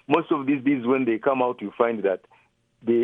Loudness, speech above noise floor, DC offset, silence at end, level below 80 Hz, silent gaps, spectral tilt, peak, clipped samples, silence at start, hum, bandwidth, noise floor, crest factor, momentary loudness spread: -24 LUFS; 30 dB; under 0.1%; 0 s; -72 dBFS; none; -9 dB/octave; -6 dBFS; under 0.1%; 0.1 s; none; 4 kHz; -53 dBFS; 18 dB; 5 LU